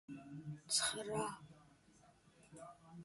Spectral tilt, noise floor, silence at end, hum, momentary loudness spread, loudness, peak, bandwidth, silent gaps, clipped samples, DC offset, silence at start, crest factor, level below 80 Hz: -2 dB/octave; -69 dBFS; 0 s; none; 22 LU; -41 LUFS; -24 dBFS; 12 kHz; none; under 0.1%; under 0.1%; 0.1 s; 24 dB; -76 dBFS